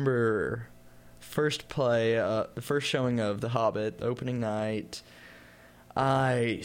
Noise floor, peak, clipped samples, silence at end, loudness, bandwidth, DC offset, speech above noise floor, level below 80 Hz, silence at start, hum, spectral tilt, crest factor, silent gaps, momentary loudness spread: -54 dBFS; -12 dBFS; under 0.1%; 0 s; -29 LUFS; 16.5 kHz; under 0.1%; 25 dB; -60 dBFS; 0 s; none; -6 dB/octave; 18 dB; none; 12 LU